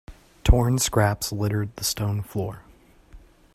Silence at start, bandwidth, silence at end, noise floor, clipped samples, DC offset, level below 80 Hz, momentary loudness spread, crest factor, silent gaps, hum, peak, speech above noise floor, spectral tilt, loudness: 0.1 s; 15.5 kHz; 0.35 s; -50 dBFS; under 0.1%; under 0.1%; -30 dBFS; 11 LU; 22 dB; none; none; -2 dBFS; 26 dB; -5 dB/octave; -24 LUFS